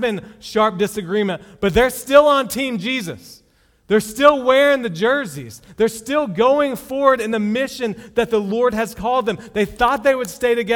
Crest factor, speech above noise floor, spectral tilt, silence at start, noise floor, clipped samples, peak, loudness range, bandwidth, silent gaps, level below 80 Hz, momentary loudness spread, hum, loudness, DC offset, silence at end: 18 dB; 37 dB; -4.5 dB/octave; 0 s; -54 dBFS; under 0.1%; 0 dBFS; 3 LU; 18.5 kHz; none; -44 dBFS; 10 LU; none; -18 LUFS; under 0.1%; 0 s